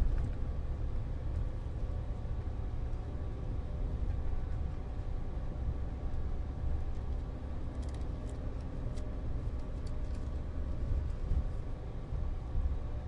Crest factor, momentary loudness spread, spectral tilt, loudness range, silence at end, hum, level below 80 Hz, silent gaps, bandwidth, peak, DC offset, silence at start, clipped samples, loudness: 18 dB; 4 LU; -8.5 dB/octave; 1 LU; 0 s; none; -36 dBFS; none; 7.6 kHz; -18 dBFS; under 0.1%; 0 s; under 0.1%; -40 LUFS